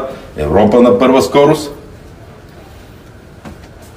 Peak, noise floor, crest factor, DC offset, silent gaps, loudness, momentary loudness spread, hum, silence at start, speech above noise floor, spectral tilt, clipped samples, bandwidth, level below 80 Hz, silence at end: 0 dBFS; -36 dBFS; 14 dB; under 0.1%; none; -10 LUFS; 25 LU; none; 0 s; 27 dB; -6 dB/octave; 0.1%; 16 kHz; -38 dBFS; 0.45 s